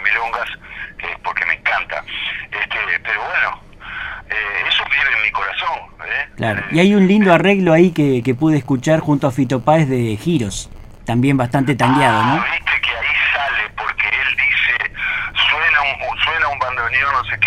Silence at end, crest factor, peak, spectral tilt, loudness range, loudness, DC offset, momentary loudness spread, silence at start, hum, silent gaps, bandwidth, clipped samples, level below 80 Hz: 0 s; 16 dB; 0 dBFS; -5.5 dB/octave; 5 LU; -16 LUFS; under 0.1%; 11 LU; 0 s; none; none; 14.5 kHz; under 0.1%; -42 dBFS